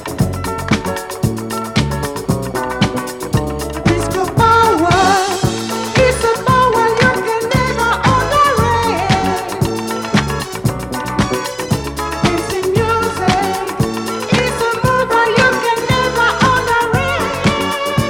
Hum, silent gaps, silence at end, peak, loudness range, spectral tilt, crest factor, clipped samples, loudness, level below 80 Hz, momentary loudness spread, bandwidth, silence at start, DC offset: none; none; 0 s; 0 dBFS; 5 LU; -5 dB/octave; 14 dB; under 0.1%; -15 LUFS; -32 dBFS; 8 LU; 17.5 kHz; 0 s; under 0.1%